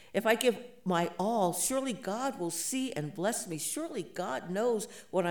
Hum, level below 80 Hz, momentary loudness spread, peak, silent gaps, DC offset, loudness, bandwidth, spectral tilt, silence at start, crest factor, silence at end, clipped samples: none; -72 dBFS; 8 LU; -14 dBFS; none; 0.1%; -32 LUFS; 19.5 kHz; -3.5 dB/octave; 0.15 s; 20 dB; 0 s; under 0.1%